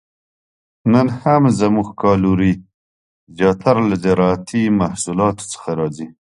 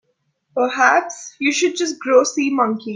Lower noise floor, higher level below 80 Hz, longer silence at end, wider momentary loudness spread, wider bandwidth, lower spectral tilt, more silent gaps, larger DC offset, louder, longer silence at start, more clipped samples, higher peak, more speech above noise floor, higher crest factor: first, under -90 dBFS vs -67 dBFS; first, -42 dBFS vs -70 dBFS; first, 0.25 s vs 0 s; about the same, 9 LU vs 8 LU; first, 11.5 kHz vs 10 kHz; first, -6.5 dB/octave vs -2.5 dB/octave; first, 2.74-3.27 s vs none; neither; about the same, -17 LUFS vs -17 LUFS; first, 0.85 s vs 0.55 s; neither; about the same, 0 dBFS vs 0 dBFS; first, over 74 dB vs 50 dB; about the same, 16 dB vs 18 dB